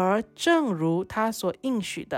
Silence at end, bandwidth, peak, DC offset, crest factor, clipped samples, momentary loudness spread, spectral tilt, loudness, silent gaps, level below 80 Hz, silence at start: 0 s; 16.5 kHz; -12 dBFS; under 0.1%; 14 dB; under 0.1%; 6 LU; -5 dB/octave; -26 LUFS; none; -62 dBFS; 0 s